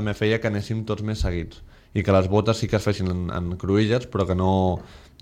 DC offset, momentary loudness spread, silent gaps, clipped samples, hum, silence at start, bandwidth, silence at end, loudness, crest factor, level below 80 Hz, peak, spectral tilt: under 0.1%; 8 LU; none; under 0.1%; none; 0 s; 12 kHz; 0.2 s; -23 LUFS; 16 dB; -38 dBFS; -8 dBFS; -7 dB/octave